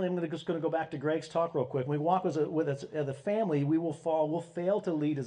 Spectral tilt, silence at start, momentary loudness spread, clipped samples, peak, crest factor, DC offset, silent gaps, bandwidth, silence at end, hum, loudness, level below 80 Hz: -8 dB/octave; 0 s; 5 LU; under 0.1%; -14 dBFS; 16 dB; under 0.1%; none; 10 kHz; 0 s; none; -31 LUFS; -74 dBFS